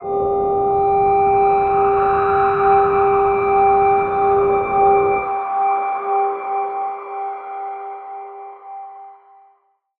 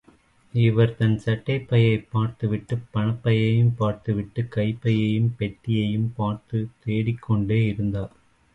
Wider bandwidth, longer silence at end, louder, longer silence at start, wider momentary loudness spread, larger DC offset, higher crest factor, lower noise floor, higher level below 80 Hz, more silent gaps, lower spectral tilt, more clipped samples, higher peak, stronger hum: about the same, 4.1 kHz vs 4.5 kHz; first, 0.85 s vs 0.45 s; first, -17 LUFS vs -24 LUFS; second, 0 s vs 0.55 s; first, 18 LU vs 8 LU; neither; about the same, 14 dB vs 16 dB; about the same, -59 dBFS vs -57 dBFS; about the same, -46 dBFS vs -50 dBFS; neither; about the same, -9.5 dB/octave vs -9 dB/octave; neither; first, -4 dBFS vs -8 dBFS; neither